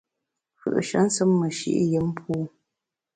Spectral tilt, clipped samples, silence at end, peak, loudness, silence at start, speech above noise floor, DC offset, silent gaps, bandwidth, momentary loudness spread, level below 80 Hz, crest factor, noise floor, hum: -5.5 dB/octave; under 0.1%; 0.65 s; -10 dBFS; -24 LUFS; 0.65 s; 62 dB; under 0.1%; none; 9.6 kHz; 9 LU; -60 dBFS; 16 dB; -85 dBFS; none